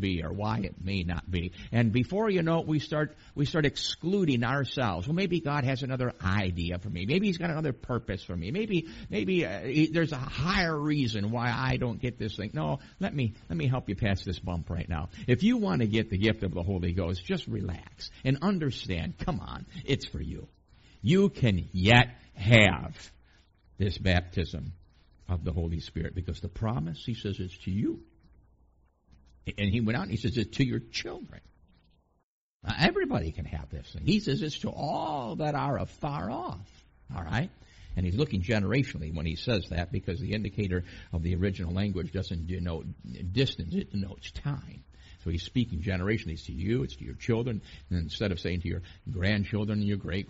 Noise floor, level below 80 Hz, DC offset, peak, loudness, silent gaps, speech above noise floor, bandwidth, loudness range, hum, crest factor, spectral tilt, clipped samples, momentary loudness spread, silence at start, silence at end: -66 dBFS; -46 dBFS; under 0.1%; -4 dBFS; -30 LUFS; 32.23-32.60 s; 36 dB; 8 kHz; 7 LU; none; 26 dB; -5 dB/octave; under 0.1%; 11 LU; 0 s; 0.05 s